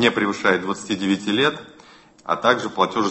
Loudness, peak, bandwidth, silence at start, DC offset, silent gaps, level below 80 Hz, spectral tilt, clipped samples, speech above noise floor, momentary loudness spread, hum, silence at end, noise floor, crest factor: -21 LUFS; -2 dBFS; 8.6 kHz; 0 s; under 0.1%; none; -60 dBFS; -4.5 dB/octave; under 0.1%; 28 dB; 7 LU; none; 0 s; -48 dBFS; 20 dB